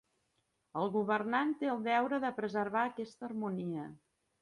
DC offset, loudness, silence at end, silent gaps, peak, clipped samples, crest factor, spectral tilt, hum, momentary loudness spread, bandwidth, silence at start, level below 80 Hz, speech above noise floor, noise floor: under 0.1%; -35 LUFS; 0.45 s; none; -18 dBFS; under 0.1%; 18 dB; -7 dB/octave; none; 11 LU; 11 kHz; 0.75 s; -80 dBFS; 45 dB; -80 dBFS